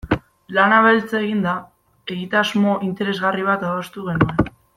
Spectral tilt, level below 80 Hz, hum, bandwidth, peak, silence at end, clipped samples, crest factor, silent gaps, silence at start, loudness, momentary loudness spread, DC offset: -6.5 dB/octave; -44 dBFS; none; 14 kHz; -2 dBFS; 0.25 s; under 0.1%; 18 dB; none; 0.05 s; -19 LUFS; 12 LU; under 0.1%